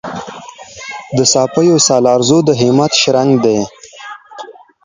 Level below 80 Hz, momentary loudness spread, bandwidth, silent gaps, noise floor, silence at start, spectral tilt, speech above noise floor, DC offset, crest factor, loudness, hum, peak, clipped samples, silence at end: -52 dBFS; 22 LU; 9.6 kHz; none; -33 dBFS; 0.05 s; -4 dB/octave; 22 dB; under 0.1%; 14 dB; -11 LUFS; none; 0 dBFS; under 0.1%; 0.3 s